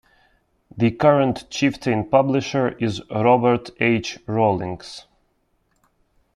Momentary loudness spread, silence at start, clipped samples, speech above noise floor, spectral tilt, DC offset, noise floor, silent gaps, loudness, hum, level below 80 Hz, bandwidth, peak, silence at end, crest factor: 10 LU; 0.75 s; under 0.1%; 47 dB; -6.5 dB/octave; under 0.1%; -67 dBFS; none; -20 LUFS; none; -54 dBFS; 11 kHz; -2 dBFS; 1.35 s; 18 dB